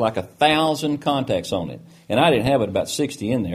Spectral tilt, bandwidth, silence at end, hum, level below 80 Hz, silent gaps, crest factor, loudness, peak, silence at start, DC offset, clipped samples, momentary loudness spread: -5 dB/octave; 15.5 kHz; 0 s; none; -50 dBFS; none; 18 dB; -21 LUFS; -2 dBFS; 0 s; under 0.1%; under 0.1%; 9 LU